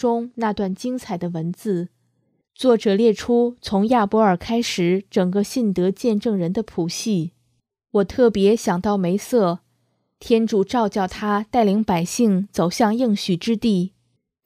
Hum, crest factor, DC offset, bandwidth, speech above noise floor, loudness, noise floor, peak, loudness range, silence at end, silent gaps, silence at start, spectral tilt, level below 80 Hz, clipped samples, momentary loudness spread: none; 16 dB; under 0.1%; 15.5 kHz; 50 dB; -20 LUFS; -69 dBFS; -4 dBFS; 3 LU; 0.6 s; none; 0 s; -6 dB/octave; -52 dBFS; under 0.1%; 8 LU